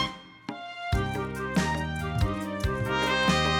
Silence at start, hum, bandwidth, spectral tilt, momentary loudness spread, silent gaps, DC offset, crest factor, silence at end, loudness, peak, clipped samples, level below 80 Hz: 0 s; none; 19 kHz; -5 dB/octave; 14 LU; none; under 0.1%; 16 dB; 0 s; -28 LUFS; -12 dBFS; under 0.1%; -40 dBFS